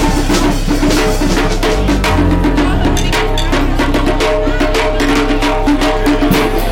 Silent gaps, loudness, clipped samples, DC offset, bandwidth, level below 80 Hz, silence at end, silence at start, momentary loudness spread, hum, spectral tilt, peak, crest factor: none; -13 LUFS; under 0.1%; 1%; 17 kHz; -16 dBFS; 0 s; 0 s; 2 LU; none; -5 dB/octave; -2 dBFS; 10 dB